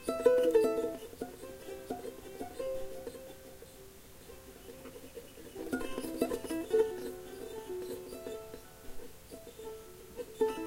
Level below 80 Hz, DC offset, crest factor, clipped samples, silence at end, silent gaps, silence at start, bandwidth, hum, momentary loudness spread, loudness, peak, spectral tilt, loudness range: -58 dBFS; under 0.1%; 24 dB; under 0.1%; 0 s; none; 0 s; 16 kHz; none; 22 LU; -36 LUFS; -12 dBFS; -4.5 dB/octave; 10 LU